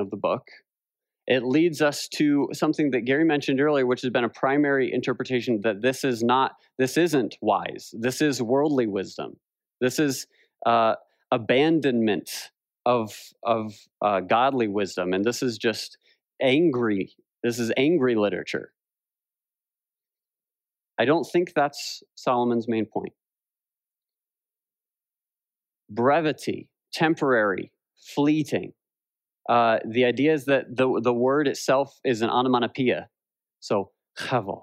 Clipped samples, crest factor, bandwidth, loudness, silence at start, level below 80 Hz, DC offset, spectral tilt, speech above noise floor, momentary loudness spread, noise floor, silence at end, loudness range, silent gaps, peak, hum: under 0.1%; 18 dB; 16 kHz; -24 LUFS; 0 s; -76 dBFS; under 0.1%; -5 dB/octave; over 66 dB; 12 LU; under -90 dBFS; 0.05 s; 6 LU; none; -8 dBFS; none